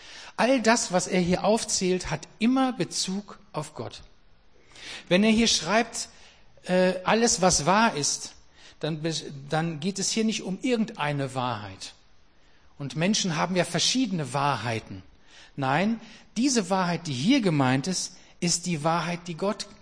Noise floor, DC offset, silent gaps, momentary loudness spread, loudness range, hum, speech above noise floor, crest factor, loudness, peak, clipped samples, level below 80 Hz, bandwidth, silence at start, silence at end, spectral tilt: -59 dBFS; 0.2%; none; 16 LU; 5 LU; none; 33 dB; 20 dB; -25 LUFS; -6 dBFS; under 0.1%; -54 dBFS; 10.5 kHz; 0 s; 0.1 s; -4 dB/octave